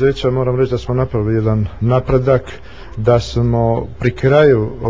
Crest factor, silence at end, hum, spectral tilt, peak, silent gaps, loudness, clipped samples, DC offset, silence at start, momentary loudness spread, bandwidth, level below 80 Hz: 14 dB; 0 s; none; -8 dB/octave; 0 dBFS; none; -15 LUFS; under 0.1%; 2%; 0 s; 7 LU; 7.6 kHz; -32 dBFS